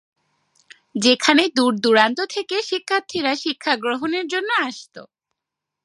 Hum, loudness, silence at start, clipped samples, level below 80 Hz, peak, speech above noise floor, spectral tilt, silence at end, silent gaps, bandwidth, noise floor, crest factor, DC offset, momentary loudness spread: none; -19 LUFS; 0.95 s; under 0.1%; -70 dBFS; 0 dBFS; 64 dB; -2.5 dB/octave; 0.8 s; none; 11.5 kHz; -84 dBFS; 22 dB; under 0.1%; 8 LU